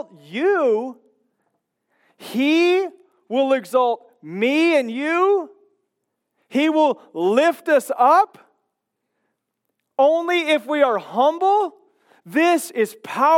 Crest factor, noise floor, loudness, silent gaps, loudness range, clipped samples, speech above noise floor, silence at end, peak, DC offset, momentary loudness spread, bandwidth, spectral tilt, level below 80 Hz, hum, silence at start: 18 dB; -77 dBFS; -19 LUFS; none; 2 LU; under 0.1%; 59 dB; 0 s; -4 dBFS; under 0.1%; 9 LU; 16.5 kHz; -4 dB/octave; under -90 dBFS; none; 0.3 s